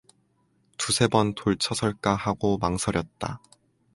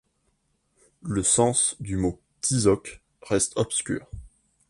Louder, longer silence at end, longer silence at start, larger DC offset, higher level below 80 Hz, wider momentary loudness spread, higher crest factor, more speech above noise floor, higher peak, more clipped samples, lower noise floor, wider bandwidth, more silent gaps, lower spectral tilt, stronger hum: about the same, -26 LUFS vs -24 LUFS; first, 0.55 s vs 0.4 s; second, 0.8 s vs 1.05 s; neither; about the same, -48 dBFS vs -48 dBFS; second, 13 LU vs 18 LU; about the same, 22 dB vs 20 dB; second, 42 dB vs 47 dB; about the same, -6 dBFS vs -8 dBFS; neither; second, -67 dBFS vs -71 dBFS; about the same, 11.5 kHz vs 11.5 kHz; neither; about the same, -4.5 dB/octave vs -4 dB/octave; neither